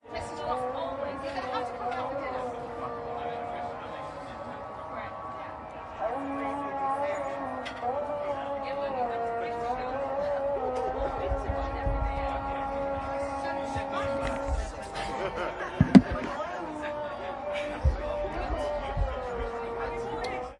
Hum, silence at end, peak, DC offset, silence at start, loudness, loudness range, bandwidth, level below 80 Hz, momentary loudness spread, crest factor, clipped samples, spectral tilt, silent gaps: none; 0 s; -2 dBFS; under 0.1%; 0.05 s; -32 LUFS; 9 LU; 11.5 kHz; -40 dBFS; 7 LU; 30 dB; under 0.1%; -7 dB/octave; none